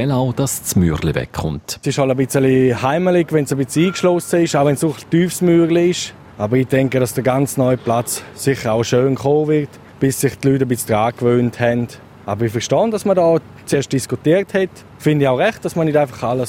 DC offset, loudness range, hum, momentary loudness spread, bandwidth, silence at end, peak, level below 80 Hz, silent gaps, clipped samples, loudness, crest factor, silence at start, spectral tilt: under 0.1%; 2 LU; none; 7 LU; 16.5 kHz; 0 s; 0 dBFS; -44 dBFS; none; under 0.1%; -17 LUFS; 16 dB; 0 s; -6 dB/octave